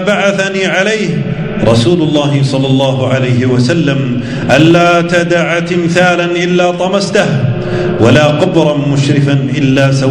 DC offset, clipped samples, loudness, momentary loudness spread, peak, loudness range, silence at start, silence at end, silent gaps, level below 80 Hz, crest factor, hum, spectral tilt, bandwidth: under 0.1%; 1%; -10 LUFS; 6 LU; 0 dBFS; 1 LU; 0 s; 0 s; none; -38 dBFS; 10 dB; none; -6 dB/octave; 10.5 kHz